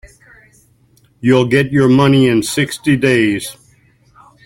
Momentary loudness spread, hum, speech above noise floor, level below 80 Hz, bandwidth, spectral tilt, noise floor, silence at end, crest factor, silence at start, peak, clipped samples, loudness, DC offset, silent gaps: 8 LU; none; 40 dB; -48 dBFS; 16.5 kHz; -6 dB/octave; -53 dBFS; 0.95 s; 14 dB; 1.25 s; -2 dBFS; under 0.1%; -13 LUFS; under 0.1%; none